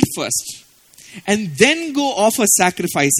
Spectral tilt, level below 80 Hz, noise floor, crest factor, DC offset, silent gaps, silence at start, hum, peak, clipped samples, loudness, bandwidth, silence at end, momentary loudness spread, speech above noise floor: -3 dB/octave; -50 dBFS; -46 dBFS; 18 dB; under 0.1%; none; 0 s; none; 0 dBFS; under 0.1%; -16 LUFS; 18 kHz; 0 s; 14 LU; 29 dB